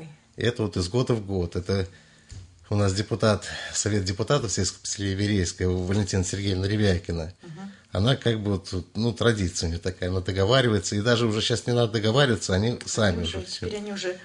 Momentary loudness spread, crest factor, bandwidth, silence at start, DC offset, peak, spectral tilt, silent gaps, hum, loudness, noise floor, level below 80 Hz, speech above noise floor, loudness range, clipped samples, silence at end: 9 LU; 20 dB; 10.5 kHz; 0 s; under 0.1%; -6 dBFS; -5 dB/octave; none; none; -25 LUFS; -45 dBFS; -52 dBFS; 20 dB; 4 LU; under 0.1%; 0 s